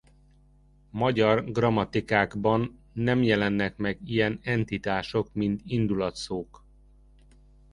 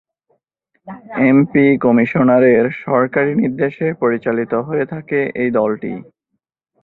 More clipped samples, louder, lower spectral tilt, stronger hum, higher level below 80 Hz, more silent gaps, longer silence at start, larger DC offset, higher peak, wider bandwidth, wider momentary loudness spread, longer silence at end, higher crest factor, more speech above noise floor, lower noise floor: neither; second, -27 LUFS vs -15 LUFS; second, -7 dB/octave vs -11 dB/octave; first, 50 Hz at -50 dBFS vs none; about the same, -52 dBFS vs -56 dBFS; neither; about the same, 0.95 s vs 0.85 s; neither; second, -6 dBFS vs -2 dBFS; first, 11 kHz vs 4.1 kHz; second, 9 LU vs 12 LU; first, 1.3 s vs 0.8 s; first, 22 dB vs 14 dB; second, 32 dB vs 59 dB; second, -58 dBFS vs -74 dBFS